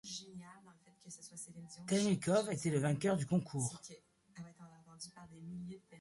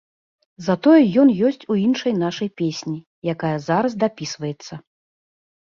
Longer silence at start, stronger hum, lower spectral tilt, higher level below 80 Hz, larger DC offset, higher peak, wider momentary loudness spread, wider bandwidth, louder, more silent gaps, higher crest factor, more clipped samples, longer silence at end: second, 0.05 s vs 0.6 s; neither; about the same, -5.5 dB/octave vs -6.5 dB/octave; second, -72 dBFS vs -62 dBFS; neither; second, -22 dBFS vs -4 dBFS; first, 21 LU vs 16 LU; first, 11.5 kHz vs 7.4 kHz; second, -37 LUFS vs -20 LUFS; second, none vs 3.07-3.22 s; about the same, 18 dB vs 16 dB; neither; second, 0 s vs 0.9 s